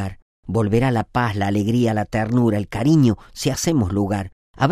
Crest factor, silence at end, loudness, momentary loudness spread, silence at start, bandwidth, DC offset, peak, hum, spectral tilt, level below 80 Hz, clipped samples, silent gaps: 16 dB; 0 s; -20 LUFS; 8 LU; 0 s; 14.5 kHz; under 0.1%; -4 dBFS; none; -6.5 dB/octave; -42 dBFS; under 0.1%; 0.22-0.43 s, 4.33-4.54 s